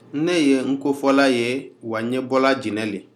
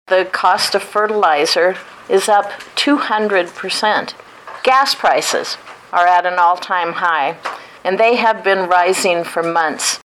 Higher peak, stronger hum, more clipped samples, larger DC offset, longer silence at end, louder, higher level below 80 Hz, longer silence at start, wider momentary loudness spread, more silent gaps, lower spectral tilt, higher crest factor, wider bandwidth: about the same, -2 dBFS vs -2 dBFS; neither; neither; neither; about the same, 0.15 s vs 0.2 s; second, -20 LUFS vs -15 LUFS; second, -76 dBFS vs -64 dBFS; about the same, 0.15 s vs 0.1 s; about the same, 10 LU vs 9 LU; neither; first, -5 dB/octave vs -2 dB/octave; about the same, 18 dB vs 14 dB; second, 13 kHz vs 17 kHz